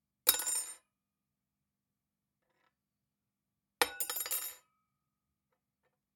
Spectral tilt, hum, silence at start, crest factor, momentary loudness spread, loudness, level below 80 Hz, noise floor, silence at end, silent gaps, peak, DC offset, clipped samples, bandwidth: 1.5 dB/octave; none; 0.25 s; 34 dB; 15 LU; -33 LUFS; -78 dBFS; -89 dBFS; 1.6 s; none; -6 dBFS; under 0.1%; under 0.1%; 19 kHz